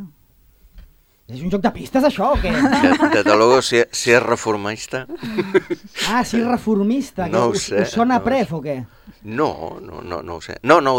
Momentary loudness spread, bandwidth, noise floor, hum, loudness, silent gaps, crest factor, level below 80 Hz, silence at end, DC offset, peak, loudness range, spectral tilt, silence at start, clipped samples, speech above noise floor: 15 LU; 16.5 kHz; -54 dBFS; none; -18 LUFS; none; 18 dB; -40 dBFS; 0 s; under 0.1%; 0 dBFS; 5 LU; -4.5 dB/octave; 0 s; under 0.1%; 36 dB